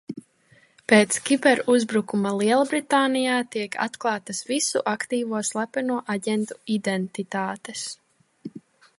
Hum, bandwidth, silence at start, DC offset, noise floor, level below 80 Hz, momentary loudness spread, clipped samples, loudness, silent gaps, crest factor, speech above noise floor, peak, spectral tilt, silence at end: none; 11.5 kHz; 0.1 s; under 0.1%; -59 dBFS; -74 dBFS; 15 LU; under 0.1%; -23 LUFS; none; 22 dB; 35 dB; -2 dBFS; -3.5 dB/octave; 0.4 s